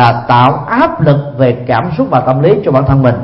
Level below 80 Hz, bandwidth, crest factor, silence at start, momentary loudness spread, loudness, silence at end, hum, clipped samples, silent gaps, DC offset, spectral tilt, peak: -36 dBFS; 5.8 kHz; 10 dB; 0 s; 4 LU; -10 LUFS; 0 s; none; 0.2%; none; under 0.1%; -9.5 dB/octave; 0 dBFS